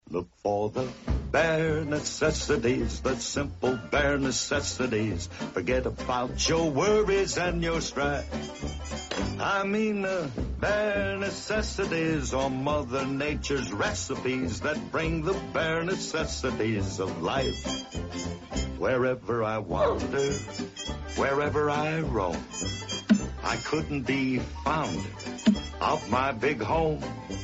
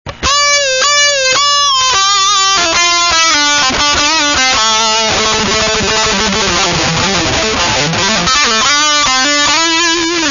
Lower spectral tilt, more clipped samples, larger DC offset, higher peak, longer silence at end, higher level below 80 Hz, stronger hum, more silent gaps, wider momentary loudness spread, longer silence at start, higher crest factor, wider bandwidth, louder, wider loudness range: first, -4.5 dB/octave vs -1 dB/octave; neither; neither; second, -10 dBFS vs 0 dBFS; about the same, 0 s vs 0 s; second, -42 dBFS vs -34 dBFS; neither; neither; first, 8 LU vs 3 LU; about the same, 0.05 s vs 0.05 s; first, 18 dB vs 10 dB; about the same, 8 kHz vs 7.4 kHz; second, -28 LUFS vs -9 LUFS; about the same, 2 LU vs 2 LU